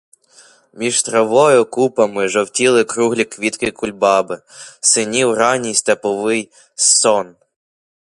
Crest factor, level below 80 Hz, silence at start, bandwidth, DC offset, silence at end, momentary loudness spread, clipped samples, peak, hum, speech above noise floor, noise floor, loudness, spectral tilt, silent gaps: 16 dB; -58 dBFS; 0.75 s; 11.5 kHz; under 0.1%; 0.85 s; 10 LU; under 0.1%; 0 dBFS; none; 33 dB; -48 dBFS; -15 LUFS; -2.5 dB/octave; none